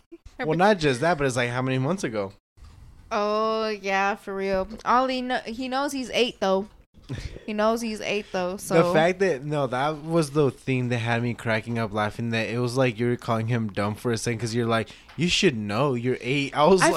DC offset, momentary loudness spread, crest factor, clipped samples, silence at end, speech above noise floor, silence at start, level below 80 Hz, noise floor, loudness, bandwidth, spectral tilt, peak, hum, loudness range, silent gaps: under 0.1%; 8 LU; 20 dB; under 0.1%; 0 s; 23 dB; 0.1 s; -50 dBFS; -47 dBFS; -25 LUFS; 14 kHz; -5 dB/octave; -6 dBFS; none; 3 LU; 2.40-2.56 s, 6.86-6.93 s